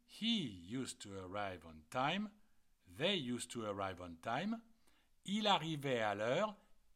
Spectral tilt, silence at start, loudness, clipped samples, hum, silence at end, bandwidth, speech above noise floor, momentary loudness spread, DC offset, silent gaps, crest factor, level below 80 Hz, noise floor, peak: -4.5 dB/octave; 0.1 s; -40 LUFS; under 0.1%; none; 0.2 s; 15.5 kHz; 31 dB; 11 LU; under 0.1%; none; 20 dB; -74 dBFS; -71 dBFS; -22 dBFS